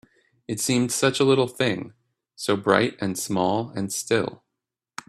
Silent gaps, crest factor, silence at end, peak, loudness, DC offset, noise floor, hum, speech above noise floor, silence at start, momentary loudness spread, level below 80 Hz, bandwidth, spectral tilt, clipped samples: none; 24 dB; 0.75 s; -2 dBFS; -23 LUFS; under 0.1%; -84 dBFS; none; 61 dB; 0.5 s; 12 LU; -62 dBFS; 15.5 kHz; -4 dB/octave; under 0.1%